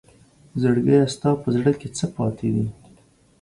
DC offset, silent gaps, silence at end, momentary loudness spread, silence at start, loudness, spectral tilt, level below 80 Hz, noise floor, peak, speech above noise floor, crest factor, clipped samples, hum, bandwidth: under 0.1%; none; 0.7 s; 10 LU; 0.55 s; -22 LUFS; -7 dB/octave; -52 dBFS; -55 dBFS; -6 dBFS; 34 dB; 16 dB; under 0.1%; none; 11.5 kHz